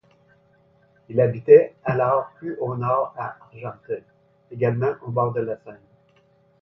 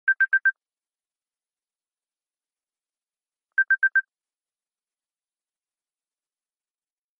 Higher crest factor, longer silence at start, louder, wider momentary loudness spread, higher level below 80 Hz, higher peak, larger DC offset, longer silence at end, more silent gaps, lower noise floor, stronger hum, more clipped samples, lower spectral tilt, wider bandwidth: about the same, 22 dB vs 18 dB; first, 1.1 s vs 0.05 s; about the same, -22 LUFS vs -22 LUFS; first, 20 LU vs 6 LU; first, -62 dBFS vs under -90 dBFS; first, -2 dBFS vs -12 dBFS; neither; second, 0.85 s vs 3.2 s; neither; second, -60 dBFS vs under -90 dBFS; neither; neither; first, -11.5 dB/octave vs 2.5 dB/octave; first, 5.6 kHz vs 3.4 kHz